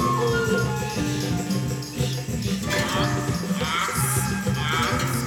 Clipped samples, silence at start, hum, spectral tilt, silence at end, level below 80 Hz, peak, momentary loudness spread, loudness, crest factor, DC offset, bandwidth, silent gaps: under 0.1%; 0 s; none; -4.5 dB/octave; 0 s; -42 dBFS; -10 dBFS; 5 LU; -24 LUFS; 14 dB; under 0.1%; 18.5 kHz; none